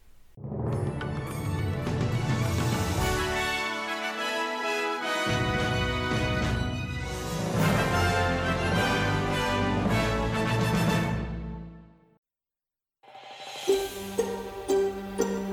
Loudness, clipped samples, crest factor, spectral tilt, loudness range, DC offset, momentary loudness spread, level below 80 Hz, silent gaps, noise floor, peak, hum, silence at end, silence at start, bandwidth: -28 LUFS; under 0.1%; 16 dB; -5 dB/octave; 6 LU; under 0.1%; 8 LU; -42 dBFS; 12.18-12.23 s; under -90 dBFS; -12 dBFS; none; 0 s; 0.05 s; 17.5 kHz